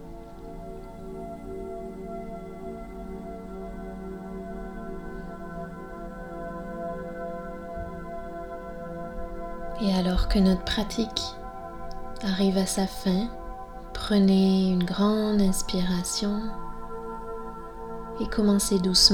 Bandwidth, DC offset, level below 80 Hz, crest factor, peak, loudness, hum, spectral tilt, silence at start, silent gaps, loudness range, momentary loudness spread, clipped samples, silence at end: 17 kHz; under 0.1%; -38 dBFS; 24 dB; -4 dBFS; -28 LUFS; none; -5 dB/octave; 0 s; none; 14 LU; 17 LU; under 0.1%; 0 s